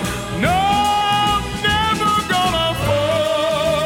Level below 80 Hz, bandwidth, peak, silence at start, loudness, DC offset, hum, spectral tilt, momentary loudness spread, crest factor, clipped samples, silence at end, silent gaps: -34 dBFS; 17.5 kHz; -6 dBFS; 0 s; -17 LUFS; under 0.1%; none; -4 dB/octave; 2 LU; 12 dB; under 0.1%; 0 s; none